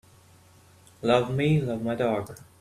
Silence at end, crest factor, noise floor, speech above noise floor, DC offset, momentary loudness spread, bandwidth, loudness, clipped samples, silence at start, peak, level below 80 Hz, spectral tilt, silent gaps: 0.15 s; 20 dB; -55 dBFS; 30 dB; under 0.1%; 9 LU; 14 kHz; -26 LUFS; under 0.1%; 1 s; -8 dBFS; -58 dBFS; -7 dB/octave; none